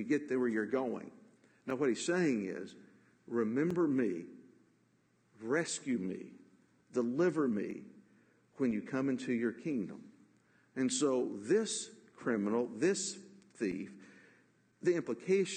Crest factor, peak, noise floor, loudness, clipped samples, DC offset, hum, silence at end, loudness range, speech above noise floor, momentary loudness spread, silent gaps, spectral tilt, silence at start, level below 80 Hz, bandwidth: 16 dB; -20 dBFS; -72 dBFS; -35 LUFS; under 0.1%; under 0.1%; none; 0 s; 3 LU; 38 dB; 15 LU; none; -5 dB/octave; 0 s; -80 dBFS; 9.4 kHz